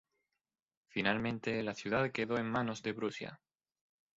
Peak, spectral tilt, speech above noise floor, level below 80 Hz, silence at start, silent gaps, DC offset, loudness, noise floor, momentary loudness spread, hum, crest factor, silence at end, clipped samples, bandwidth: -16 dBFS; -4 dB/octave; over 54 dB; -70 dBFS; 0.95 s; none; under 0.1%; -36 LUFS; under -90 dBFS; 8 LU; none; 24 dB; 0.8 s; under 0.1%; 7.6 kHz